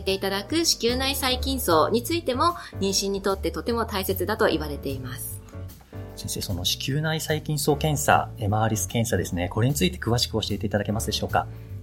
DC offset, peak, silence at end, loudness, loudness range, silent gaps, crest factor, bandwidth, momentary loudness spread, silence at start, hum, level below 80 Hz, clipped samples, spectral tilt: under 0.1%; -4 dBFS; 0 s; -25 LUFS; 4 LU; none; 22 dB; 17 kHz; 11 LU; 0 s; none; -40 dBFS; under 0.1%; -4 dB/octave